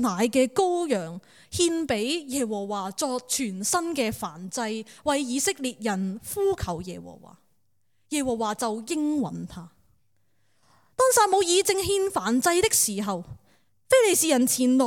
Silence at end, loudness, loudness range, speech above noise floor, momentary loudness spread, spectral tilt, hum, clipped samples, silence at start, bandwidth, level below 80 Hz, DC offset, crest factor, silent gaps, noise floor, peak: 0 s; -25 LUFS; 8 LU; 50 dB; 14 LU; -3 dB/octave; none; under 0.1%; 0 s; 18 kHz; -56 dBFS; under 0.1%; 20 dB; none; -75 dBFS; -6 dBFS